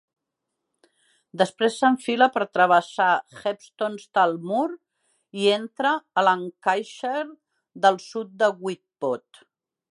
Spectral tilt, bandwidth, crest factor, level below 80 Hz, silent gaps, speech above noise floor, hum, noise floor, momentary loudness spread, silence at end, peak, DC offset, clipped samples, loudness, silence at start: -4.5 dB/octave; 11.5 kHz; 20 dB; -80 dBFS; none; 59 dB; none; -82 dBFS; 11 LU; 0.75 s; -4 dBFS; under 0.1%; under 0.1%; -23 LUFS; 1.35 s